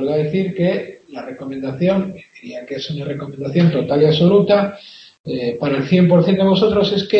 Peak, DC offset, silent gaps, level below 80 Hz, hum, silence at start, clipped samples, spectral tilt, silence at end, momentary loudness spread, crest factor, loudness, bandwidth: -2 dBFS; under 0.1%; 5.20-5.24 s; -52 dBFS; none; 0 s; under 0.1%; -8 dB/octave; 0 s; 19 LU; 16 dB; -17 LUFS; 6.2 kHz